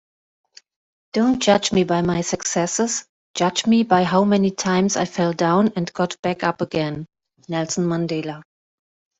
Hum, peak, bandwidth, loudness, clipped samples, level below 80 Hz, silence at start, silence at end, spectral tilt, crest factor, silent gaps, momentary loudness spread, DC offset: none; -2 dBFS; 8.4 kHz; -20 LUFS; under 0.1%; -56 dBFS; 1.15 s; 0.8 s; -4.5 dB/octave; 18 dB; 3.09-3.34 s, 6.19-6.23 s; 10 LU; under 0.1%